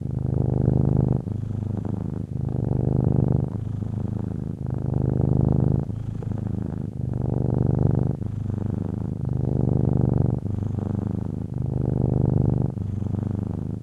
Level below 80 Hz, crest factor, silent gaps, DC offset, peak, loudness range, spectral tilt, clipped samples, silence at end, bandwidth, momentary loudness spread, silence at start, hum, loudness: -38 dBFS; 16 dB; none; under 0.1%; -8 dBFS; 2 LU; -11.5 dB/octave; under 0.1%; 0 s; 2.5 kHz; 8 LU; 0 s; none; -25 LUFS